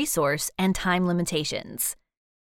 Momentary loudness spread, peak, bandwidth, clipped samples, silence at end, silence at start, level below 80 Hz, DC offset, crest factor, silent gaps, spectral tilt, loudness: 5 LU; -10 dBFS; 18 kHz; under 0.1%; 0.5 s; 0 s; -48 dBFS; under 0.1%; 16 dB; none; -4 dB/octave; -26 LUFS